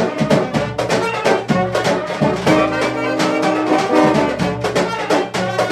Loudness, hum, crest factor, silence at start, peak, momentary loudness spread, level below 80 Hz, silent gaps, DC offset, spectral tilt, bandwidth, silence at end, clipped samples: -17 LUFS; none; 16 dB; 0 s; 0 dBFS; 4 LU; -44 dBFS; none; under 0.1%; -5.5 dB/octave; 14.5 kHz; 0 s; under 0.1%